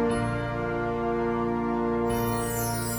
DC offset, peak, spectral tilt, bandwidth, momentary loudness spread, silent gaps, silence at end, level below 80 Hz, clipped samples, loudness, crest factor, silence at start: under 0.1%; -16 dBFS; -5.5 dB/octave; over 20 kHz; 2 LU; none; 0 s; -42 dBFS; under 0.1%; -28 LUFS; 12 dB; 0 s